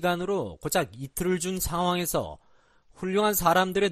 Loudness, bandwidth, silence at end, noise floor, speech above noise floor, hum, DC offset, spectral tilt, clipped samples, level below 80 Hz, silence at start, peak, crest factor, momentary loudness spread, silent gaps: -27 LUFS; 14.5 kHz; 0 s; -59 dBFS; 33 dB; none; under 0.1%; -4 dB/octave; under 0.1%; -48 dBFS; 0 s; -8 dBFS; 20 dB; 9 LU; none